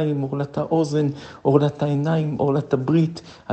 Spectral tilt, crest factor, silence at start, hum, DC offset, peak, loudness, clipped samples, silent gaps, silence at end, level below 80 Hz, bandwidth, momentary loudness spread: -8.5 dB/octave; 18 dB; 0 s; none; under 0.1%; -2 dBFS; -22 LUFS; under 0.1%; none; 0 s; -58 dBFS; 8.6 kHz; 7 LU